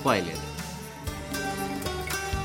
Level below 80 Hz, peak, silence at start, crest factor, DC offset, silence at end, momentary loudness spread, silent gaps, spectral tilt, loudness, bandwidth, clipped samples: -44 dBFS; -8 dBFS; 0 s; 22 dB; under 0.1%; 0 s; 9 LU; none; -4 dB/octave; -31 LUFS; 17.5 kHz; under 0.1%